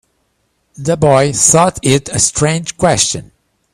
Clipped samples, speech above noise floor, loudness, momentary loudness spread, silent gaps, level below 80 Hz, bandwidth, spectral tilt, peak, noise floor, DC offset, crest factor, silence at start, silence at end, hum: under 0.1%; 51 dB; -12 LUFS; 8 LU; none; -42 dBFS; over 20 kHz; -3.5 dB/octave; 0 dBFS; -63 dBFS; under 0.1%; 14 dB; 0.8 s; 0.55 s; none